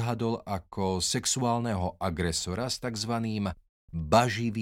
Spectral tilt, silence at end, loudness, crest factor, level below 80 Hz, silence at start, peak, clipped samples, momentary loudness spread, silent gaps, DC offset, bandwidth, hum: -4.5 dB/octave; 0 s; -29 LUFS; 24 dB; -50 dBFS; 0 s; -6 dBFS; under 0.1%; 11 LU; 3.69-3.88 s; under 0.1%; 16.5 kHz; none